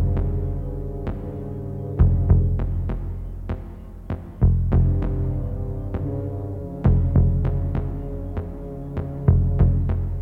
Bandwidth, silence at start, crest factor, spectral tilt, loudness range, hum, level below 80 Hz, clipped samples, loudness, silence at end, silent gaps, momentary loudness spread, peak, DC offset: 3 kHz; 0 s; 18 dB; -11.5 dB/octave; 2 LU; none; -26 dBFS; under 0.1%; -24 LUFS; 0 s; none; 13 LU; -4 dBFS; under 0.1%